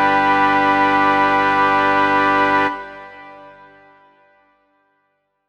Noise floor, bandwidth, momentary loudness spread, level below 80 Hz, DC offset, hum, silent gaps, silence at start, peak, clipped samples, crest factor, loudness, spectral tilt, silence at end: -68 dBFS; 9.4 kHz; 16 LU; -50 dBFS; under 0.1%; 50 Hz at -55 dBFS; none; 0 s; -2 dBFS; under 0.1%; 16 dB; -15 LUFS; -5 dB/octave; 2 s